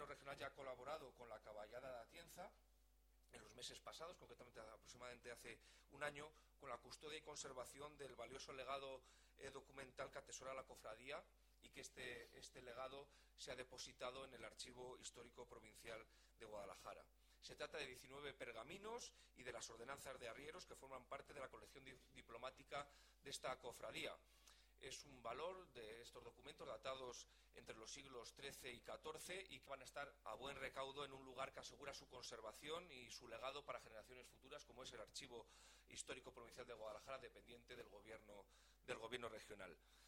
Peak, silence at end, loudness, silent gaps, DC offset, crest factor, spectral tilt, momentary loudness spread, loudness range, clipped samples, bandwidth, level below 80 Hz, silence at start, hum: -32 dBFS; 0 s; -56 LUFS; none; under 0.1%; 24 dB; -2.5 dB/octave; 10 LU; 4 LU; under 0.1%; 18 kHz; -76 dBFS; 0 s; none